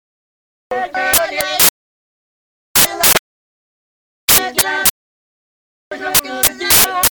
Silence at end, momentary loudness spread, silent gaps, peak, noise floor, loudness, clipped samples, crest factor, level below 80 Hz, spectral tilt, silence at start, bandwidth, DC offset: 0.05 s; 11 LU; 1.69-2.75 s, 3.19-4.28 s, 4.90-5.91 s; 0 dBFS; under -90 dBFS; -12 LUFS; under 0.1%; 18 dB; -44 dBFS; 0 dB/octave; 0.7 s; over 20 kHz; under 0.1%